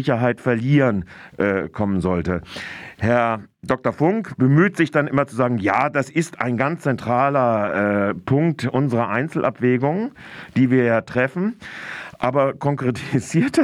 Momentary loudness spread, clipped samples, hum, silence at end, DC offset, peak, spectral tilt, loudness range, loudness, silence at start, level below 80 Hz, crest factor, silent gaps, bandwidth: 9 LU; under 0.1%; none; 0 s; under 0.1%; -4 dBFS; -7.5 dB/octave; 2 LU; -20 LUFS; 0 s; -54 dBFS; 16 dB; none; 12 kHz